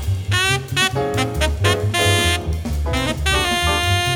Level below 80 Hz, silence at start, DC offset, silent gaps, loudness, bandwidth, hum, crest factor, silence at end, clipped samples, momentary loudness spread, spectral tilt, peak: -28 dBFS; 0 s; under 0.1%; none; -18 LUFS; over 20 kHz; none; 16 dB; 0 s; under 0.1%; 5 LU; -3.5 dB/octave; -2 dBFS